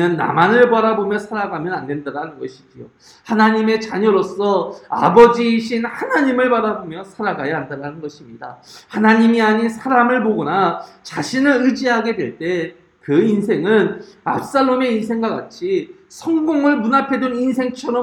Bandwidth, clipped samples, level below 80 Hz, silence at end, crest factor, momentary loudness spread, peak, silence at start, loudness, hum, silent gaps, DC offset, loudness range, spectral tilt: 11.5 kHz; under 0.1%; -58 dBFS; 0 s; 16 dB; 16 LU; 0 dBFS; 0 s; -17 LUFS; none; none; under 0.1%; 4 LU; -6 dB/octave